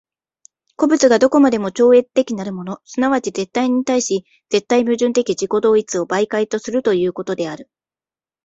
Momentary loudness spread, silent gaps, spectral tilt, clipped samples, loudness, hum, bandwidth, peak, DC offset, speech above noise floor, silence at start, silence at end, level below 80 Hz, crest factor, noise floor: 11 LU; none; -4.5 dB/octave; under 0.1%; -17 LUFS; none; 8 kHz; -2 dBFS; under 0.1%; over 74 dB; 0.8 s; 0.8 s; -60 dBFS; 16 dB; under -90 dBFS